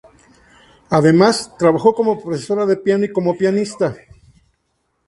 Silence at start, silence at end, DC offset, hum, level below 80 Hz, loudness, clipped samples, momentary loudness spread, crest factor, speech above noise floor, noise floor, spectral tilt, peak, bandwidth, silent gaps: 0.9 s; 1.1 s; under 0.1%; none; -54 dBFS; -16 LUFS; under 0.1%; 9 LU; 18 dB; 53 dB; -68 dBFS; -6 dB/octave; 0 dBFS; 11.5 kHz; none